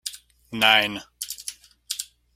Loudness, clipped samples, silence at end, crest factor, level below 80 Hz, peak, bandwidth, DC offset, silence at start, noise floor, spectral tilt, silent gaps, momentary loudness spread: -22 LUFS; under 0.1%; 0.3 s; 26 dB; -64 dBFS; -2 dBFS; 16.5 kHz; under 0.1%; 0.05 s; -41 dBFS; -1 dB/octave; none; 19 LU